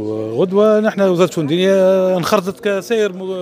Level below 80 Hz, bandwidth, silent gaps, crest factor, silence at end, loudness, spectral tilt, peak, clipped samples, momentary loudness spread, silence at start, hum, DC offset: -64 dBFS; 16 kHz; none; 14 dB; 0 s; -15 LUFS; -6 dB/octave; 0 dBFS; under 0.1%; 7 LU; 0 s; none; under 0.1%